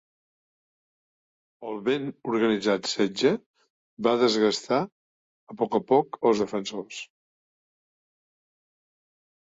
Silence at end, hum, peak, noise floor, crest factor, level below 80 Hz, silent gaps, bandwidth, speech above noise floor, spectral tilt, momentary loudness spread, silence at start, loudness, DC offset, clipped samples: 2.4 s; none; -8 dBFS; under -90 dBFS; 20 dB; -70 dBFS; 3.46-3.54 s, 3.70-3.97 s, 4.92-5.47 s; 8 kHz; over 65 dB; -4.5 dB/octave; 15 LU; 1.6 s; -25 LUFS; under 0.1%; under 0.1%